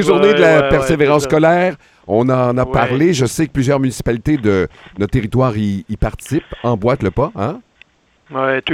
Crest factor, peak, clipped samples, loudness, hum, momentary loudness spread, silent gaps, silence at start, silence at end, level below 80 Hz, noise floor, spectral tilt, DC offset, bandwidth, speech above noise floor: 14 dB; 0 dBFS; under 0.1%; -15 LUFS; none; 11 LU; none; 0 s; 0 s; -34 dBFS; -50 dBFS; -6 dB/octave; under 0.1%; 15.5 kHz; 36 dB